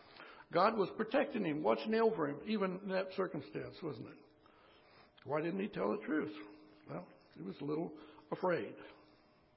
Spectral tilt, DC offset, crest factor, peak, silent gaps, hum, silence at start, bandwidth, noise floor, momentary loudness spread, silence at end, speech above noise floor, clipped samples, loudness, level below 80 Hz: -5 dB/octave; under 0.1%; 22 dB; -18 dBFS; none; none; 0.05 s; 5.6 kHz; -67 dBFS; 21 LU; 0.6 s; 30 dB; under 0.1%; -38 LUFS; -78 dBFS